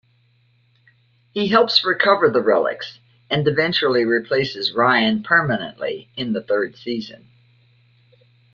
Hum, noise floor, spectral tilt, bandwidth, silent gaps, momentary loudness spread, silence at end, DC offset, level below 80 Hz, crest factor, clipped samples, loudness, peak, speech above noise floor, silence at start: none; -59 dBFS; -6 dB/octave; 7.2 kHz; none; 13 LU; 1.4 s; under 0.1%; -60 dBFS; 20 dB; under 0.1%; -19 LUFS; -2 dBFS; 41 dB; 1.35 s